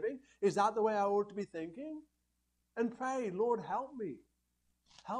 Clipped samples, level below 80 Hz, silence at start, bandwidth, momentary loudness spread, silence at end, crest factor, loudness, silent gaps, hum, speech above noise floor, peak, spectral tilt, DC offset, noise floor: under 0.1%; -78 dBFS; 0 s; 10.5 kHz; 16 LU; 0 s; 20 dB; -36 LUFS; none; 60 Hz at -70 dBFS; 45 dB; -18 dBFS; -6 dB/octave; under 0.1%; -81 dBFS